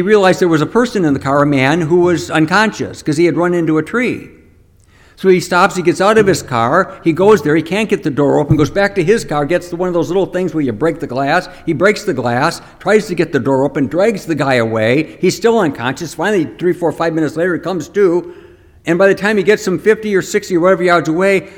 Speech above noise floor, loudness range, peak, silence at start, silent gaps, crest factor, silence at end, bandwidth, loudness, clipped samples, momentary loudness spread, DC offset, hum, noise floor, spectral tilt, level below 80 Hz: 34 dB; 3 LU; 0 dBFS; 0 s; none; 14 dB; 0 s; 17 kHz; -14 LUFS; under 0.1%; 6 LU; under 0.1%; none; -47 dBFS; -6 dB/octave; -44 dBFS